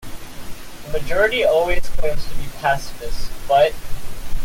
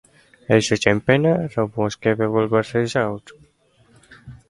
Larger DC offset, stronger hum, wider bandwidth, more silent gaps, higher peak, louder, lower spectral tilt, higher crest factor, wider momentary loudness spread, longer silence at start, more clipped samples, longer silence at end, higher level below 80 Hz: neither; neither; first, 16 kHz vs 11.5 kHz; neither; second, -4 dBFS vs 0 dBFS; about the same, -20 LUFS vs -20 LUFS; second, -4 dB/octave vs -5.5 dB/octave; second, 12 dB vs 20 dB; first, 20 LU vs 7 LU; second, 0.05 s vs 0.5 s; neither; second, 0 s vs 0.15 s; first, -28 dBFS vs -52 dBFS